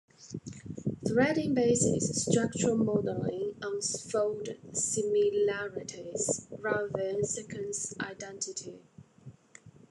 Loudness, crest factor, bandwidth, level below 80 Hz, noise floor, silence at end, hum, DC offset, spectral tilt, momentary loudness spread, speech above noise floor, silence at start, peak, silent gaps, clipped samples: -31 LUFS; 20 dB; 12 kHz; -66 dBFS; -56 dBFS; 0.2 s; none; under 0.1%; -4.5 dB/octave; 12 LU; 25 dB; 0.2 s; -12 dBFS; none; under 0.1%